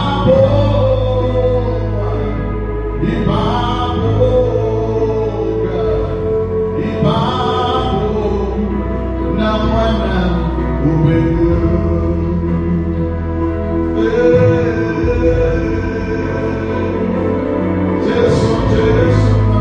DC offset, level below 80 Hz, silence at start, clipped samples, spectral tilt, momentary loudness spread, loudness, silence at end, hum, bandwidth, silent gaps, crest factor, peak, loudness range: under 0.1%; -24 dBFS; 0 s; under 0.1%; -8.5 dB/octave; 6 LU; -15 LUFS; 0 s; none; 8.6 kHz; none; 12 dB; 0 dBFS; 2 LU